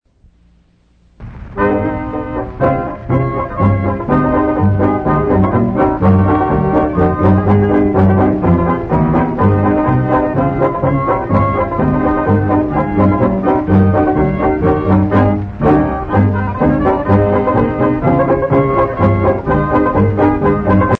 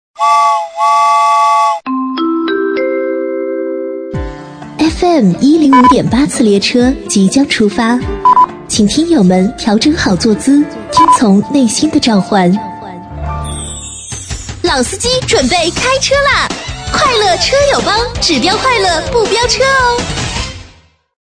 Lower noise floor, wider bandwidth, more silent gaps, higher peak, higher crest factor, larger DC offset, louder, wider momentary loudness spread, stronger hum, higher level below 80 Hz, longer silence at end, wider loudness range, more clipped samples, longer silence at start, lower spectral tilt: first, -51 dBFS vs -44 dBFS; second, 4.4 kHz vs 11 kHz; neither; about the same, -2 dBFS vs 0 dBFS; about the same, 10 dB vs 10 dB; neither; second, -13 LUFS vs -10 LUFS; second, 4 LU vs 12 LU; neither; about the same, -28 dBFS vs -30 dBFS; second, 0.05 s vs 0.7 s; about the same, 3 LU vs 5 LU; neither; first, 1.2 s vs 0.2 s; first, -11 dB/octave vs -4 dB/octave